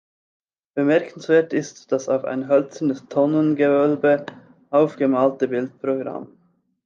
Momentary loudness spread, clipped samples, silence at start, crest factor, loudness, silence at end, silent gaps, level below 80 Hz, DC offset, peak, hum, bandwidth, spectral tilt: 8 LU; under 0.1%; 0.75 s; 16 dB; -21 LUFS; 0.6 s; none; -74 dBFS; under 0.1%; -4 dBFS; none; 7.4 kHz; -7 dB/octave